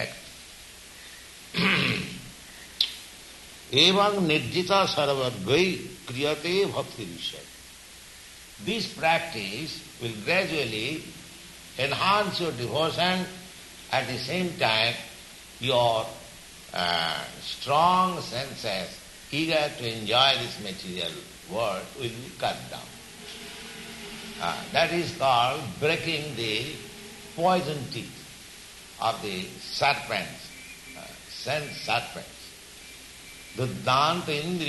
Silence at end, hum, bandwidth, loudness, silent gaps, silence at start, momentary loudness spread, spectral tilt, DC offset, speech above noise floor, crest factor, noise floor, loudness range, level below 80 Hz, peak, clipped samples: 0 s; none; 12 kHz; -26 LUFS; none; 0 s; 21 LU; -4 dB/octave; under 0.1%; 20 dB; 22 dB; -47 dBFS; 7 LU; -58 dBFS; -6 dBFS; under 0.1%